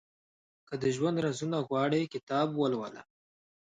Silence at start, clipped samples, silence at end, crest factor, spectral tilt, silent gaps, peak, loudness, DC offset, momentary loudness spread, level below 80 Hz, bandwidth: 0.7 s; under 0.1%; 0.8 s; 16 dB; -6 dB/octave; 2.23-2.27 s; -16 dBFS; -31 LUFS; under 0.1%; 10 LU; -72 dBFS; 9.4 kHz